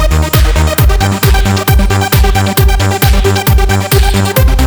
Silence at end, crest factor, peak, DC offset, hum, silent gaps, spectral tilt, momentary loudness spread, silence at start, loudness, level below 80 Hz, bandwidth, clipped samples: 0 s; 8 dB; 0 dBFS; under 0.1%; none; none; -5 dB/octave; 1 LU; 0 s; -10 LUFS; -12 dBFS; over 20 kHz; under 0.1%